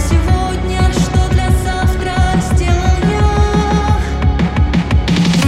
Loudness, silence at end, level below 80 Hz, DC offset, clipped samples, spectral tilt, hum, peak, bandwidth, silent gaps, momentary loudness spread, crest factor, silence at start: -14 LUFS; 0 s; -16 dBFS; under 0.1%; under 0.1%; -6 dB/octave; none; -2 dBFS; 13.5 kHz; none; 3 LU; 10 dB; 0 s